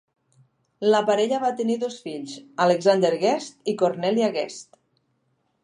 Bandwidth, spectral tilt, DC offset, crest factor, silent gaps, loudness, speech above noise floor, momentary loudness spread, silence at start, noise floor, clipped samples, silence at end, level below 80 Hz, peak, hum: 11 kHz; -5 dB/octave; under 0.1%; 18 dB; none; -23 LUFS; 48 dB; 14 LU; 0.8 s; -71 dBFS; under 0.1%; 1 s; -78 dBFS; -6 dBFS; none